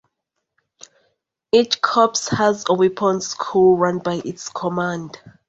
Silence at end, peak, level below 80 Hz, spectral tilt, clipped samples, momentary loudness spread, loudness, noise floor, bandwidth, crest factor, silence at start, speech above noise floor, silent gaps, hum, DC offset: 0.2 s; -2 dBFS; -58 dBFS; -4.5 dB/octave; under 0.1%; 11 LU; -19 LUFS; -78 dBFS; 8 kHz; 18 dB; 1.55 s; 59 dB; none; none; under 0.1%